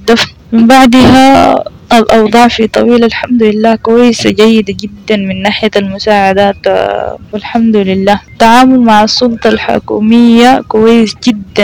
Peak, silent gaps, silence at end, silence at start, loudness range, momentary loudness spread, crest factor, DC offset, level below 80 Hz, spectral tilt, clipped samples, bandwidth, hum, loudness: 0 dBFS; none; 0 s; 0 s; 4 LU; 9 LU; 6 dB; under 0.1%; -34 dBFS; -5 dB/octave; 10%; 15.5 kHz; none; -7 LUFS